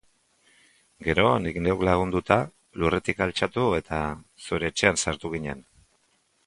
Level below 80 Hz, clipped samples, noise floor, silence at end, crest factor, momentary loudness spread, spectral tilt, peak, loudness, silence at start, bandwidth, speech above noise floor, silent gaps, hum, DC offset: -44 dBFS; under 0.1%; -68 dBFS; 0.85 s; 24 dB; 11 LU; -4.5 dB/octave; -2 dBFS; -25 LUFS; 1 s; 11.5 kHz; 43 dB; none; none; under 0.1%